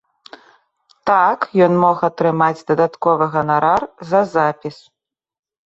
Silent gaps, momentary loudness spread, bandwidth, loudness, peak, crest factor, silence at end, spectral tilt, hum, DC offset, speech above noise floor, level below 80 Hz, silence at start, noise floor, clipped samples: none; 5 LU; 8 kHz; -16 LUFS; -2 dBFS; 16 dB; 1 s; -7.5 dB/octave; none; under 0.1%; 43 dB; -58 dBFS; 1.05 s; -58 dBFS; under 0.1%